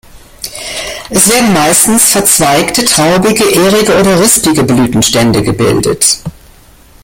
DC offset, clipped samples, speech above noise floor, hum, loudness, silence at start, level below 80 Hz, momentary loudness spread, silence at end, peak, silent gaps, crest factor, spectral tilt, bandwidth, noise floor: under 0.1%; 0.5%; 31 dB; none; -7 LUFS; 0.15 s; -34 dBFS; 13 LU; 0.75 s; 0 dBFS; none; 10 dB; -3 dB/octave; over 20 kHz; -39 dBFS